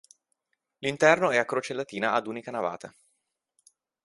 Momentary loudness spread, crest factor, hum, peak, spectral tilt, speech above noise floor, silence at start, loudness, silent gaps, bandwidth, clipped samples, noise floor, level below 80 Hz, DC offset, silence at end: 13 LU; 24 dB; none; -4 dBFS; -4 dB/octave; 52 dB; 0.8 s; -26 LUFS; none; 11.5 kHz; under 0.1%; -78 dBFS; -72 dBFS; under 0.1%; 1.15 s